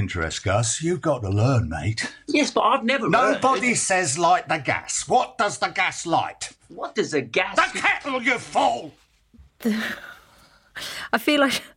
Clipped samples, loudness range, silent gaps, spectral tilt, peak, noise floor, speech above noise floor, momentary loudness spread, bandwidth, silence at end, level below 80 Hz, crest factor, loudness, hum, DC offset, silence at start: under 0.1%; 5 LU; none; -4 dB/octave; -4 dBFS; -55 dBFS; 32 dB; 12 LU; 16.5 kHz; 0.1 s; -52 dBFS; 18 dB; -22 LUFS; none; under 0.1%; 0 s